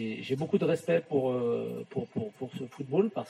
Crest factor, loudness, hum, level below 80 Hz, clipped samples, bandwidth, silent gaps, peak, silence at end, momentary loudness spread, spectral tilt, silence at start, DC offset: 16 dB; -31 LUFS; none; -76 dBFS; under 0.1%; 13 kHz; none; -14 dBFS; 0 s; 11 LU; -7.5 dB/octave; 0 s; under 0.1%